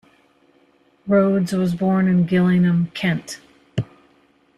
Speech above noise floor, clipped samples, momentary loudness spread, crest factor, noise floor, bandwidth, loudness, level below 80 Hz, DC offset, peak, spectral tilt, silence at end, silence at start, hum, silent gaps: 40 dB; under 0.1%; 18 LU; 14 dB; -58 dBFS; 12 kHz; -19 LUFS; -56 dBFS; under 0.1%; -6 dBFS; -7.5 dB/octave; 0.75 s; 1.05 s; none; none